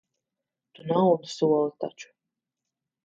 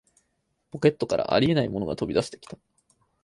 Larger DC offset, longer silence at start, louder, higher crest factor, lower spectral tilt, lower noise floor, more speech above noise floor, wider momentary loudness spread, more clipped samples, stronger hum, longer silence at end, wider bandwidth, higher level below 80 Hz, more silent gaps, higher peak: neither; about the same, 0.85 s vs 0.75 s; about the same, -25 LUFS vs -25 LUFS; about the same, 18 dB vs 20 dB; about the same, -7 dB/octave vs -6.5 dB/octave; first, -87 dBFS vs -75 dBFS; first, 62 dB vs 50 dB; second, 14 LU vs 21 LU; neither; neither; first, 1 s vs 0.7 s; second, 7.8 kHz vs 11.5 kHz; second, -78 dBFS vs -54 dBFS; neither; second, -10 dBFS vs -6 dBFS